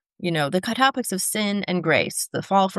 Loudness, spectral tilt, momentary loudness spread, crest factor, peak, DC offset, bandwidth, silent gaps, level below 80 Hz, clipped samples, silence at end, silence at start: -22 LUFS; -3.5 dB/octave; 4 LU; 18 dB; -4 dBFS; under 0.1%; 12.5 kHz; none; -68 dBFS; under 0.1%; 0 s; 0.2 s